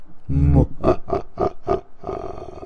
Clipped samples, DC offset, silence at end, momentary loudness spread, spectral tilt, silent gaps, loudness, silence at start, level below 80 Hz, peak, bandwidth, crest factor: under 0.1%; under 0.1%; 0 s; 14 LU; -10 dB/octave; none; -22 LUFS; 0 s; -30 dBFS; -2 dBFS; 6.6 kHz; 18 dB